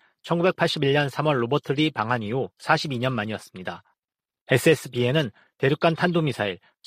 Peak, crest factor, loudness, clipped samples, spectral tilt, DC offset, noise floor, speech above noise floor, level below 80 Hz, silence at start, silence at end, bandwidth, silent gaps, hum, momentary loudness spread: -4 dBFS; 20 dB; -24 LUFS; under 0.1%; -6 dB/octave; under 0.1%; under -90 dBFS; over 67 dB; -62 dBFS; 0.25 s; 0.3 s; 15.5 kHz; 4.41-4.46 s; none; 11 LU